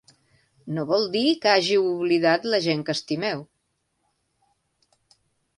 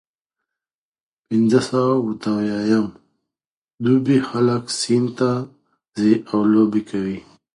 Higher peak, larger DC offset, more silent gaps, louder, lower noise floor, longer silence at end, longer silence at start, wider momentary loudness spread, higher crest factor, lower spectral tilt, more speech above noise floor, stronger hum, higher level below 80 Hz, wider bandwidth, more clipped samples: second, -6 dBFS vs -2 dBFS; neither; second, none vs 3.47-3.65 s, 3.74-3.78 s; second, -22 LUFS vs -19 LUFS; second, -74 dBFS vs under -90 dBFS; first, 2.15 s vs 0.35 s; second, 0.65 s vs 1.3 s; about the same, 10 LU vs 10 LU; about the same, 20 dB vs 18 dB; about the same, -5 dB/octave vs -6 dB/octave; second, 52 dB vs over 72 dB; neither; second, -70 dBFS vs -60 dBFS; about the same, 11.5 kHz vs 11.5 kHz; neither